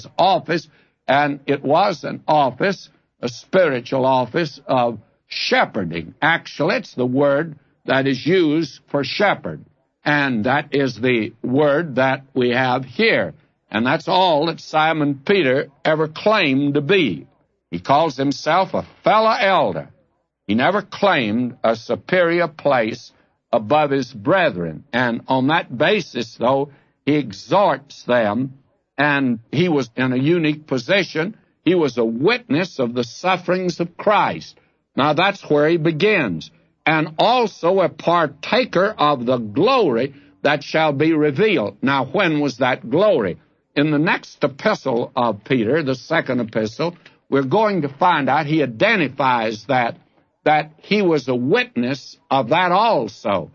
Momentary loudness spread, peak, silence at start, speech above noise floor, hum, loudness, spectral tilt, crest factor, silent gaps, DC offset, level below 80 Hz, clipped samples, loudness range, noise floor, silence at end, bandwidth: 8 LU; -2 dBFS; 0 s; 46 dB; none; -19 LUFS; -6 dB/octave; 16 dB; none; under 0.1%; -62 dBFS; under 0.1%; 2 LU; -64 dBFS; 0.05 s; 7.2 kHz